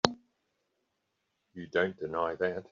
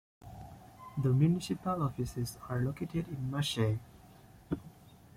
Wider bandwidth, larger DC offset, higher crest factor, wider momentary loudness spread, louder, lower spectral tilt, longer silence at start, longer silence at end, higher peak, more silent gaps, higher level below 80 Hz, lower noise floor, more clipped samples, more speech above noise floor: second, 7.4 kHz vs 16 kHz; neither; first, 32 dB vs 18 dB; second, 19 LU vs 22 LU; about the same, -32 LUFS vs -34 LUFS; second, -2.5 dB/octave vs -6.5 dB/octave; second, 0.05 s vs 0.25 s; second, 0.1 s vs 0.3 s; first, -4 dBFS vs -16 dBFS; neither; second, -68 dBFS vs -58 dBFS; first, -81 dBFS vs -57 dBFS; neither; first, 48 dB vs 24 dB